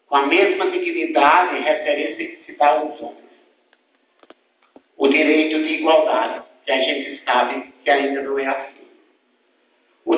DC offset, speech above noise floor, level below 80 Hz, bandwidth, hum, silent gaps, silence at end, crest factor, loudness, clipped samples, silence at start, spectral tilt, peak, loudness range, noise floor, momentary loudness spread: under 0.1%; 45 dB; -70 dBFS; 4 kHz; none; none; 0 s; 20 dB; -18 LUFS; under 0.1%; 0.1 s; -6 dB/octave; 0 dBFS; 5 LU; -63 dBFS; 15 LU